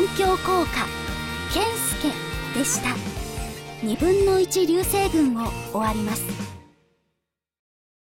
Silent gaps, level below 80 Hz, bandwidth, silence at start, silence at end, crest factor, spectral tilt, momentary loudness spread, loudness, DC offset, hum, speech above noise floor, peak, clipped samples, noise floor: none; -38 dBFS; 17 kHz; 0 s; 1.4 s; 14 dB; -4 dB/octave; 11 LU; -23 LUFS; under 0.1%; none; 58 dB; -10 dBFS; under 0.1%; -80 dBFS